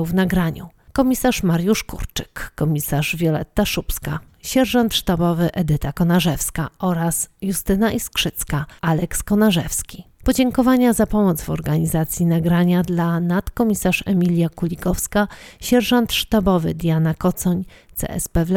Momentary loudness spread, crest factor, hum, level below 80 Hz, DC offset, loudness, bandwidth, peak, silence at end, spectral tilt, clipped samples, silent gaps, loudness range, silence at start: 9 LU; 16 dB; none; -36 dBFS; under 0.1%; -19 LUFS; 18 kHz; -4 dBFS; 0 s; -5.5 dB/octave; under 0.1%; none; 2 LU; 0 s